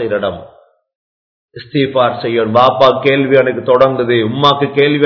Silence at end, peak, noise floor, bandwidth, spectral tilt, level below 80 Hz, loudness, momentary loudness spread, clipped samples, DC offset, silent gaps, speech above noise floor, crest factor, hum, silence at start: 0 s; 0 dBFS; under -90 dBFS; 5.4 kHz; -7.5 dB/octave; -52 dBFS; -12 LUFS; 8 LU; 0.5%; under 0.1%; 0.95-1.48 s; over 78 dB; 12 dB; none; 0 s